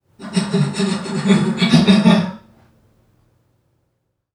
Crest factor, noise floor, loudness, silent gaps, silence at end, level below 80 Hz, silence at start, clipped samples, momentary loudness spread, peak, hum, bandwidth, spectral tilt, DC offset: 18 dB; -70 dBFS; -16 LUFS; none; 1.95 s; -54 dBFS; 0.2 s; under 0.1%; 10 LU; 0 dBFS; none; 11 kHz; -6 dB/octave; under 0.1%